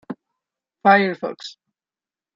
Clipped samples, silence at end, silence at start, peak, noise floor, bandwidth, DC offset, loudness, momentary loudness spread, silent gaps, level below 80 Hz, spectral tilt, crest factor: under 0.1%; 0.85 s; 0.1 s; -2 dBFS; under -90 dBFS; 7.6 kHz; under 0.1%; -18 LUFS; 22 LU; none; -72 dBFS; -6 dB/octave; 20 dB